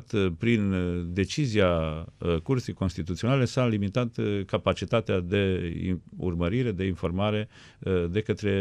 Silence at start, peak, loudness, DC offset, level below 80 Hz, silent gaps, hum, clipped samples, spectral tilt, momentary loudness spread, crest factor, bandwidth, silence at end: 0 s; -10 dBFS; -27 LUFS; under 0.1%; -50 dBFS; none; none; under 0.1%; -7 dB/octave; 7 LU; 16 dB; 10.5 kHz; 0 s